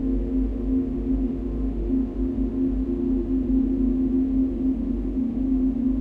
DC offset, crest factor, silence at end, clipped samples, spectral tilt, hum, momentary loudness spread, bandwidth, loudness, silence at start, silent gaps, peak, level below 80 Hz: under 0.1%; 10 dB; 0 s; under 0.1%; -11 dB/octave; none; 4 LU; 3.1 kHz; -25 LUFS; 0 s; none; -12 dBFS; -30 dBFS